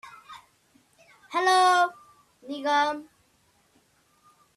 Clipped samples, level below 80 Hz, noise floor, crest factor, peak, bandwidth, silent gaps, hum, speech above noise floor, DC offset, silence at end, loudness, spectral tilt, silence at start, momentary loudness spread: under 0.1%; -78 dBFS; -65 dBFS; 20 dB; -10 dBFS; 13.5 kHz; none; none; 43 dB; under 0.1%; 1.55 s; -23 LUFS; -1 dB/octave; 0.05 s; 26 LU